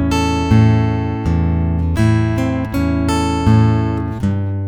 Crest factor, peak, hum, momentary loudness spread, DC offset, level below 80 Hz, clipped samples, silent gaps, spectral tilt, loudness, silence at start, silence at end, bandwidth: 14 dB; 0 dBFS; none; 6 LU; under 0.1%; -26 dBFS; under 0.1%; none; -7.5 dB/octave; -16 LUFS; 0 s; 0 s; 12 kHz